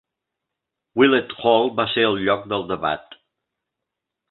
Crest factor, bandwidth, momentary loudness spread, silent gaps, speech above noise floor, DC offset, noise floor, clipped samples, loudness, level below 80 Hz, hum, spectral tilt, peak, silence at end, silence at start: 22 dB; 4.3 kHz; 9 LU; none; 63 dB; under 0.1%; -83 dBFS; under 0.1%; -20 LUFS; -58 dBFS; none; -9.5 dB/octave; -2 dBFS; 1.3 s; 0.95 s